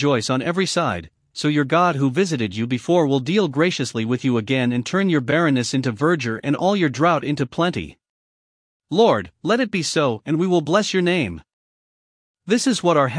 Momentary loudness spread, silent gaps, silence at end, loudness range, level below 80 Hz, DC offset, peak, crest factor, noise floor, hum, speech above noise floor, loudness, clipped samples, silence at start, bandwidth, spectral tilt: 6 LU; 8.09-8.80 s, 11.53-12.34 s; 0 s; 2 LU; -56 dBFS; under 0.1%; -2 dBFS; 18 dB; under -90 dBFS; none; over 71 dB; -20 LUFS; under 0.1%; 0 s; 10.5 kHz; -5.5 dB/octave